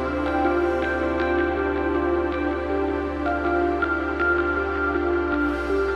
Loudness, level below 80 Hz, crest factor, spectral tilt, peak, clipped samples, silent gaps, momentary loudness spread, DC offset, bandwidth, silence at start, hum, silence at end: -23 LUFS; -36 dBFS; 14 dB; -7.5 dB/octave; -10 dBFS; under 0.1%; none; 3 LU; under 0.1%; 7.4 kHz; 0 s; none; 0 s